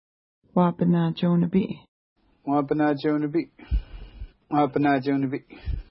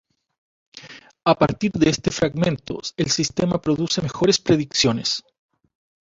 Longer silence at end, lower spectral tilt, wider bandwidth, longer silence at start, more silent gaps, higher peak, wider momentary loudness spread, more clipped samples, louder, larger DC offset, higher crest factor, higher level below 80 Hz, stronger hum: second, 0.1 s vs 0.8 s; first, -12 dB/octave vs -4.5 dB/octave; second, 5.6 kHz vs 7.8 kHz; second, 0.55 s vs 0.75 s; first, 1.88-2.16 s vs none; second, -8 dBFS vs -2 dBFS; first, 14 LU vs 8 LU; neither; second, -25 LUFS vs -21 LUFS; neither; about the same, 18 dB vs 20 dB; first, -38 dBFS vs -50 dBFS; neither